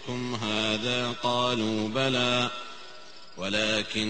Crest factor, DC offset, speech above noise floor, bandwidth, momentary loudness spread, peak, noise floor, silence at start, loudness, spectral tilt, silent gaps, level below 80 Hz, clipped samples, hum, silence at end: 18 dB; 0.6%; 21 dB; 8.8 kHz; 18 LU; -10 dBFS; -48 dBFS; 0 s; -27 LUFS; -4 dB/octave; none; -60 dBFS; under 0.1%; none; 0 s